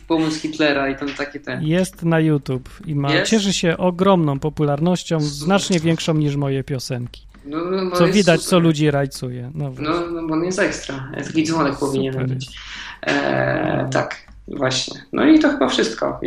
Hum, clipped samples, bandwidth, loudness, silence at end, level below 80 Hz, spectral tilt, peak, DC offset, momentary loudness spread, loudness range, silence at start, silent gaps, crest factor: none; under 0.1%; 14.5 kHz; -19 LUFS; 0 s; -46 dBFS; -5.5 dB/octave; -2 dBFS; under 0.1%; 12 LU; 3 LU; 0.05 s; none; 18 dB